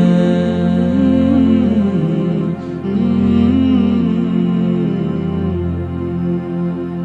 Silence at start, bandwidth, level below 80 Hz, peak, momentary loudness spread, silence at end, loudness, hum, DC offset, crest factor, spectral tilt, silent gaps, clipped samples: 0 s; 7.2 kHz; -38 dBFS; -2 dBFS; 8 LU; 0 s; -15 LUFS; none; 0.1%; 12 dB; -9.5 dB/octave; none; under 0.1%